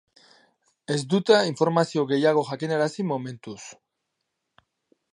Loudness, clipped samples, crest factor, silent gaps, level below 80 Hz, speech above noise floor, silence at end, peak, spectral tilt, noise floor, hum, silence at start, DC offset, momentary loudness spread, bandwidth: -23 LUFS; under 0.1%; 22 dB; none; -76 dBFS; 57 dB; 1.4 s; -4 dBFS; -5.5 dB/octave; -80 dBFS; none; 0.9 s; under 0.1%; 20 LU; 11 kHz